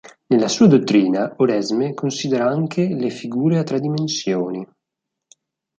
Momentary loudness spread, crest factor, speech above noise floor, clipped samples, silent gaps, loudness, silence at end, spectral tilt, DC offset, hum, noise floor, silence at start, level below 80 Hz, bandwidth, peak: 10 LU; 16 dB; 64 dB; under 0.1%; none; -19 LUFS; 1.15 s; -6 dB/octave; under 0.1%; none; -82 dBFS; 0.3 s; -62 dBFS; 9.2 kHz; -2 dBFS